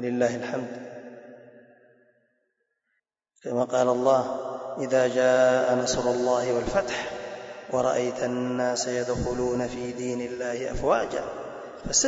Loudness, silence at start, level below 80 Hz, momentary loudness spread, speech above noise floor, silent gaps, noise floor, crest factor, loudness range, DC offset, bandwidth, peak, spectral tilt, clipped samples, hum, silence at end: -26 LUFS; 0 s; -50 dBFS; 16 LU; 53 dB; none; -78 dBFS; 18 dB; 9 LU; under 0.1%; 8 kHz; -10 dBFS; -3.5 dB/octave; under 0.1%; none; 0 s